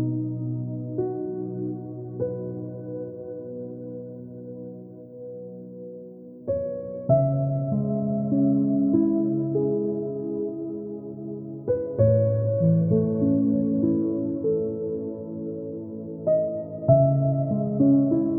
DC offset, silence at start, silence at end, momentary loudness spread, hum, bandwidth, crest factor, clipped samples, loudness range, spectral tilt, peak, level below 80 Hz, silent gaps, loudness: under 0.1%; 0 s; 0 s; 18 LU; none; 2 kHz; 20 dB; under 0.1%; 12 LU; -16.5 dB/octave; -6 dBFS; -56 dBFS; none; -25 LUFS